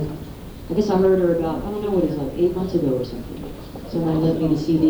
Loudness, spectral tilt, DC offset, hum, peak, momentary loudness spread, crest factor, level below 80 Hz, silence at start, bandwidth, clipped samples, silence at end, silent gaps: -21 LUFS; -8.5 dB/octave; under 0.1%; none; -6 dBFS; 17 LU; 14 dB; -40 dBFS; 0 s; over 20 kHz; under 0.1%; 0 s; none